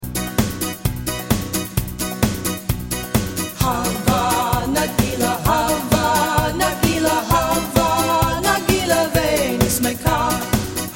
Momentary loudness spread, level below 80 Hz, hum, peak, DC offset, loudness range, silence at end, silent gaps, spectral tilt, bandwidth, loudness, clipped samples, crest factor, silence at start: 6 LU; -32 dBFS; none; 0 dBFS; under 0.1%; 4 LU; 0 s; none; -4.5 dB/octave; 17 kHz; -19 LUFS; under 0.1%; 18 dB; 0 s